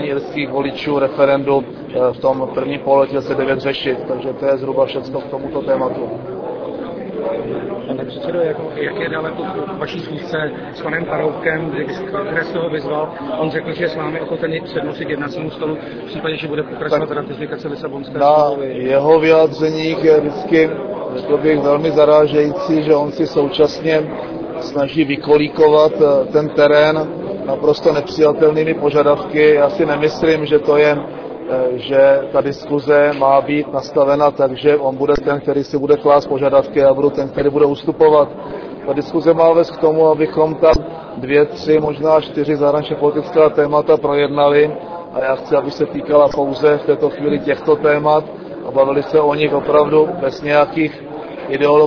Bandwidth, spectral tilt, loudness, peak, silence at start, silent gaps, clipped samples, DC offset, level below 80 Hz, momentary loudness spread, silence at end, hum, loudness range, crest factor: 5.4 kHz; -7 dB/octave; -15 LUFS; 0 dBFS; 0 s; none; under 0.1%; under 0.1%; -44 dBFS; 12 LU; 0 s; none; 8 LU; 14 dB